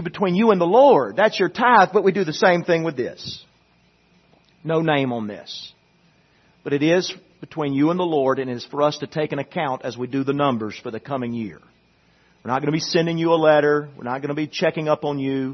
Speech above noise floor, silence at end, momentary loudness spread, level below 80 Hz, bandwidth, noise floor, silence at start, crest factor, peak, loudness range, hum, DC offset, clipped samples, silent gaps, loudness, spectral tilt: 39 dB; 0 s; 17 LU; -64 dBFS; 6.4 kHz; -59 dBFS; 0 s; 20 dB; 0 dBFS; 9 LU; none; under 0.1%; under 0.1%; none; -20 LUFS; -6 dB/octave